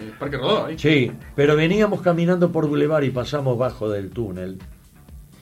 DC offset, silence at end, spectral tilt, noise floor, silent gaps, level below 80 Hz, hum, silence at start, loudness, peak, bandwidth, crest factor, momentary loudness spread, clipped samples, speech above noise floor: under 0.1%; 0.2 s; -7 dB/octave; -44 dBFS; none; -46 dBFS; none; 0 s; -21 LUFS; -4 dBFS; 15.5 kHz; 18 dB; 11 LU; under 0.1%; 23 dB